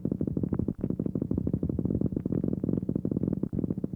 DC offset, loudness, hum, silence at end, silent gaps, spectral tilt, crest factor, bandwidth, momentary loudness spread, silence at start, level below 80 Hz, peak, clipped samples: under 0.1%; -31 LUFS; none; 0 s; none; -13 dB/octave; 16 dB; 2.5 kHz; 2 LU; 0 s; -44 dBFS; -14 dBFS; under 0.1%